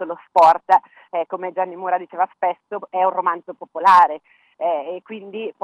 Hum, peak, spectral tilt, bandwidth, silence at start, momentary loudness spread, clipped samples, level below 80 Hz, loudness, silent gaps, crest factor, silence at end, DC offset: none; -2 dBFS; -4.5 dB/octave; 11 kHz; 0 s; 17 LU; under 0.1%; -70 dBFS; -19 LUFS; none; 18 dB; 0.1 s; under 0.1%